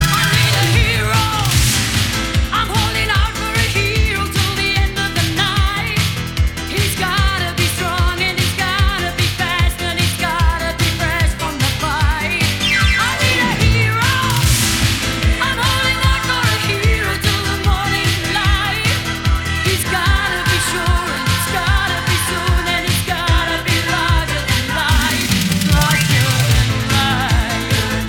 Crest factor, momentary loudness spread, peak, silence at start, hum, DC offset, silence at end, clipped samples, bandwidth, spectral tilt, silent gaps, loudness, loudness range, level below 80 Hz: 14 dB; 4 LU; -2 dBFS; 0 s; none; under 0.1%; 0 s; under 0.1%; 20 kHz; -3.5 dB/octave; none; -15 LUFS; 2 LU; -22 dBFS